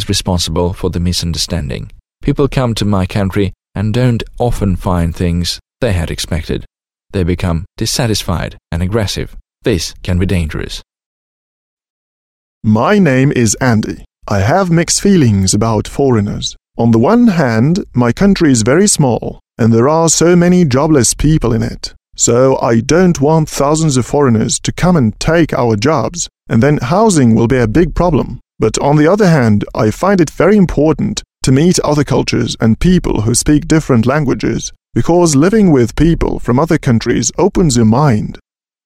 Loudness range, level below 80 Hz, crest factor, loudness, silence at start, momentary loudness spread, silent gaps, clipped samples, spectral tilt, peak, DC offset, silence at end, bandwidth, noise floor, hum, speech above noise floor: 6 LU; -28 dBFS; 12 dB; -12 LUFS; 0 s; 10 LU; 11.06-11.77 s, 11.90-12.61 s; under 0.1%; -5.5 dB/octave; 0 dBFS; under 0.1%; 0.5 s; 15.5 kHz; under -90 dBFS; none; over 79 dB